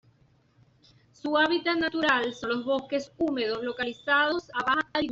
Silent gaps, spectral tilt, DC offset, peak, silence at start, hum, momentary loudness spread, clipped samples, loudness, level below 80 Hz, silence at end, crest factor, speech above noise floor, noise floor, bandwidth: none; -4 dB/octave; under 0.1%; -10 dBFS; 1.25 s; none; 7 LU; under 0.1%; -27 LUFS; -64 dBFS; 0 s; 18 dB; 36 dB; -63 dBFS; 7.8 kHz